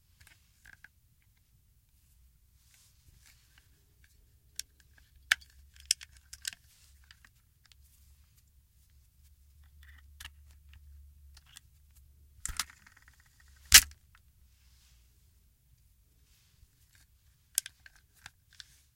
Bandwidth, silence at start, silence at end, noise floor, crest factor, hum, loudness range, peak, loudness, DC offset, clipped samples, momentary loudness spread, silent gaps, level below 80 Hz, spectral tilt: 16.5 kHz; 5.3 s; 5.1 s; -67 dBFS; 36 dB; none; 22 LU; -2 dBFS; -27 LUFS; under 0.1%; under 0.1%; 36 LU; none; -54 dBFS; 2 dB/octave